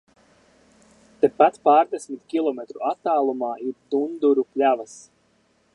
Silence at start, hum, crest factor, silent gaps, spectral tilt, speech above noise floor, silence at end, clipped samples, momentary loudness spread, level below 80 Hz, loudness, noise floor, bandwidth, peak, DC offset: 1.2 s; none; 20 dB; none; -5 dB/octave; 42 dB; 0.75 s; under 0.1%; 10 LU; -74 dBFS; -22 LUFS; -63 dBFS; 11 kHz; -4 dBFS; under 0.1%